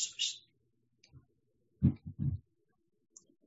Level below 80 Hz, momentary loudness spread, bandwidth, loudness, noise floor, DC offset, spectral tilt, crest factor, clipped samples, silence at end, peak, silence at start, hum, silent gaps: -52 dBFS; 12 LU; 7.6 kHz; -36 LUFS; -78 dBFS; under 0.1%; -5.5 dB/octave; 24 dB; under 0.1%; 1.05 s; -14 dBFS; 0 s; none; none